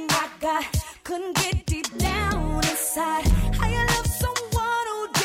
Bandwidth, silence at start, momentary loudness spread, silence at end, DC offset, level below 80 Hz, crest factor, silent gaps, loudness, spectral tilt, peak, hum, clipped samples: 16.5 kHz; 0 s; 4 LU; 0 s; under 0.1%; -30 dBFS; 16 dB; none; -24 LUFS; -3.5 dB/octave; -8 dBFS; none; under 0.1%